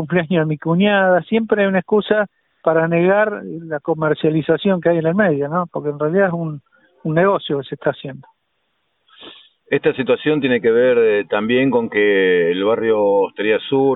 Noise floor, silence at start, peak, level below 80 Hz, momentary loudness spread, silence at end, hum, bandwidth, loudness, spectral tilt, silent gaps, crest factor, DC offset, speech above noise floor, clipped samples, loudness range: -69 dBFS; 0 s; -2 dBFS; -58 dBFS; 9 LU; 0 s; none; 4.1 kHz; -17 LUFS; -11.5 dB/octave; none; 16 dB; under 0.1%; 53 dB; under 0.1%; 6 LU